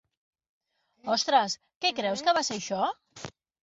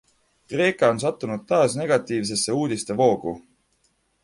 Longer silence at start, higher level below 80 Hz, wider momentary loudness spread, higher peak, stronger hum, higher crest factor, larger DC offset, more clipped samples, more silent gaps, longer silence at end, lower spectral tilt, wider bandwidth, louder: first, 1.05 s vs 0.5 s; second, -72 dBFS vs -62 dBFS; first, 19 LU vs 11 LU; second, -10 dBFS vs -6 dBFS; neither; about the same, 20 dB vs 18 dB; neither; neither; first, 1.76-1.81 s vs none; second, 0.35 s vs 0.85 s; second, -2 dB/octave vs -4.5 dB/octave; second, 8 kHz vs 11.5 kHz; second, -27 LUFS vs -22 LUFS